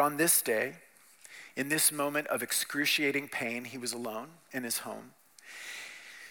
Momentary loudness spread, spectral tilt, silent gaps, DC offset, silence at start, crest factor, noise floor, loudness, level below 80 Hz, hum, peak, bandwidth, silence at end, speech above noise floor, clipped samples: 19 LU; -1.5 dB/octave; none; under 0.1%; 0 s; 24 dB; -57 dBFS; -30 LUFS; -86 dBFS; none; -10 dBFS; 18 kHz; 0 s; 25 dB; under 0.1%